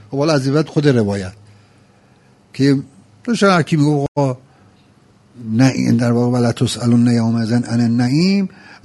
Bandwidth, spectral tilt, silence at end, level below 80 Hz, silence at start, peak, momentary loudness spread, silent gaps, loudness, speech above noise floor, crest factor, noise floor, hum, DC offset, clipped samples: 11.5 kHz; -6.5 dB/octave; 0.1 s; -54 dBFS; 0.1 s; 0 dBFS; 10 LU; 4.08-4.15 s; -16 LUFS; 36 dB; 16 dB; -50 dBFS; none; under 0.1%; under 0.1%